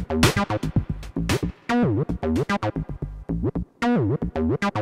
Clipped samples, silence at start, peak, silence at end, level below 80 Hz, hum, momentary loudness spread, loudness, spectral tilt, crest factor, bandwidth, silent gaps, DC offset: under 0.1%; 0 s; -4 dBFS; 0 s; -36 dBFS; none; 9 LU; -24 LUFS; -6 dB/octave; 20 dB; 16 kHz; none; under 0.1%